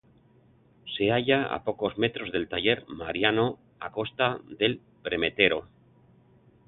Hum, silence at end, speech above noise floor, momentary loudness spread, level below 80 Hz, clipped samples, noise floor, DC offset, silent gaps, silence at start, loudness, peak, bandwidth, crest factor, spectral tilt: none; 1 s; 33 dB; 11 LU; -58 dBFS; under 0.1%; -60 dBFS; under 0.1%; none; 0.85 s; -27 LUFS; -6 dBFS; 4.2 kHz; 22 dB; -9 dB/octave